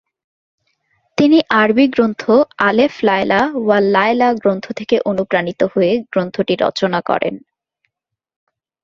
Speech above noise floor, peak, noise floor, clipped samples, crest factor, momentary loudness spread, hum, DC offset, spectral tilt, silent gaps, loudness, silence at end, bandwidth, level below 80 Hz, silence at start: 65 dB; 0 dBFS; -79 dBFS; under 0.1%; 16 dB; 6 LU; none; under 0.1%; -6.5 dB/octave; none; -15 LUFS; 1.45 s; 7.4 kHz; -56 dBFS; 1.2 s